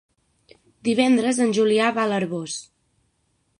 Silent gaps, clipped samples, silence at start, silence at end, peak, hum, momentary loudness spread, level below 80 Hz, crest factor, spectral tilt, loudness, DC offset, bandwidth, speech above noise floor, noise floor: none; under 0.1%; 0.85 s; 1 s; -4 dBFS; none; 11 LU; -68 dBFS; 18 dB; -4.5 dB/octave; -21 LUFS; under 0.1%; 11 kHz; 48 dB; -69 dBFS